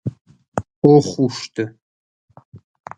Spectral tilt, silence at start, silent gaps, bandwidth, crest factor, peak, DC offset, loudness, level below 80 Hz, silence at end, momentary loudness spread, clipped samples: -7 dB/octave; 0.05 s; 0.21-0.25 s, 0.48-0.52 s, 0.76-0.82 s, 1.82-2.28 s, 2.45-2.52 s; 9 kHz; 20 dB; 0 dBFS; under 0.1%; -18 LUFS; -54 dBFS; 0.4 s; 16 LU; under 0.1%